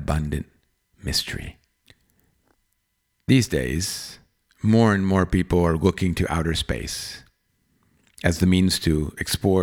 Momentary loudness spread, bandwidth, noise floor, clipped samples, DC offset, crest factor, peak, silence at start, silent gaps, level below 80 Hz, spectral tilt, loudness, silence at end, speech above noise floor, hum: 16 LU; 18 kHz; -73 dBFS; under 0.1%; under 0.1%; 20 dB; -4 dBFS; 0 s; none; -38 dBFS; -5.5 dB/octave; -22 LUFS; 0 s; 51 dB; none